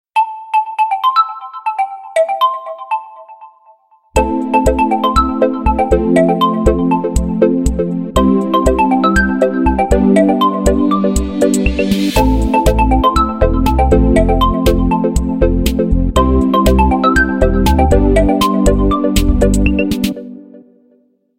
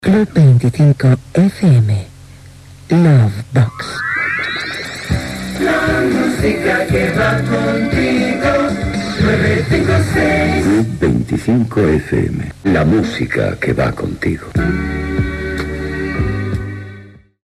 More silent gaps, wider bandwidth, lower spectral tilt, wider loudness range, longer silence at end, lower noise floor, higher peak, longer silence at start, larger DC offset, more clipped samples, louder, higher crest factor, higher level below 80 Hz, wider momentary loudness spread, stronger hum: neither; first, 16.5 kHz vs 13 kHz; about the same, -6 dB/octave vs -7 dB/octave; about the same, 4 LU vs 4 LU; first, 0.8 s vs 0.35 s; first, -54 dBFS vs -38 dBFS; about the same, 0 dBFS vs -2 dBFS; first, 0.15 s vs 0 s; neither; neither; about the same, -13 LUFS vs -15 LUFS; about the same, 12 dB vs 12 dB; first, -20 dBFS vs -32 dBFS; second, 6 LU vs 9 LU; neither